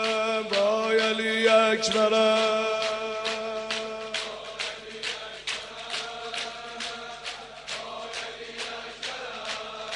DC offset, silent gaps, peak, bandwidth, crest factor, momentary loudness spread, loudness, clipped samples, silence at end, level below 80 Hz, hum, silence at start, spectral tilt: under 0.1%; none; -8 dBFS; 10.5 kHz; 20 dB; 14 LU; -27 LUFS; under 0.1%; 0 s; -64 dBFS; none; 0 s; -2 dB/octave